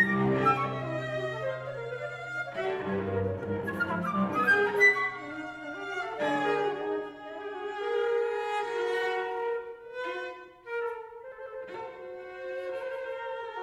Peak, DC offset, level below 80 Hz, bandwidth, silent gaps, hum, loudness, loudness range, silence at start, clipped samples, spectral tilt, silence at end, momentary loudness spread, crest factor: -12 dBFS; under 0.1%; -66 dBFS; 13.5 kHz; none; none; -30 LUFS; 11 LU; 0 s; under 0.1%; -6 dB/octave; 0 s; 16 LU; 20 dB